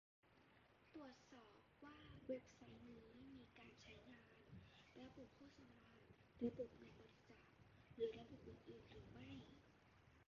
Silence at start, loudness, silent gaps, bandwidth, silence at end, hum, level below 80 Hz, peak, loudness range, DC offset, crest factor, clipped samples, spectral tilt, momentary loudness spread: 0.25 s; -58 LUFS; none; 7 kHz; 0.05 s; none; -78 dBFS; -34 dBFS; 9 LU; under 0.1%; 24 dB; under 0.1%; -5.5 dB/octave; 17 LU